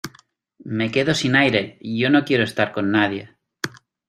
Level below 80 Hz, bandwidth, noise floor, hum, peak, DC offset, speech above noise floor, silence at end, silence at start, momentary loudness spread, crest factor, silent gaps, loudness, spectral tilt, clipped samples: -58 dBFS; 14.5 kHz; -55 dBFS; none; -2 dBFS; under 0.1%; 36 dB; 0.4 s; 0.05 s; 14 LU; 20 dB; none; -19 LUFS; -5 dB/octave; under 0.1%